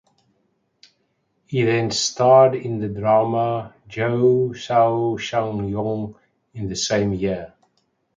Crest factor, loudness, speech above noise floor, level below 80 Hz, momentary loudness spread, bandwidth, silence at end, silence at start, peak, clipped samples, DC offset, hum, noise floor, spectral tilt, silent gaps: 18 dB; -20 LUFS; 49 dB; -52 dBFS; 14 LU; 9.4 kHz; 0.7 s; 1.5 s; -2 dBFS; under 0.1%; under 0.1%; none; -69 dBFS; -5 dB/octave; none